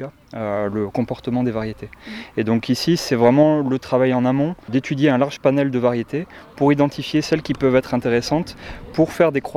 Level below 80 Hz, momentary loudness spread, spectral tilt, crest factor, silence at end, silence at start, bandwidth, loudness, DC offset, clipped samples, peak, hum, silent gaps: -48 dBFS; 12 LU; -6.5 dB/octave; 16 dB; 0 s; 0 s; 14.5 kHz; -19 LUFS; under 0.1%; under 0.1%; -2 dBFS; none; none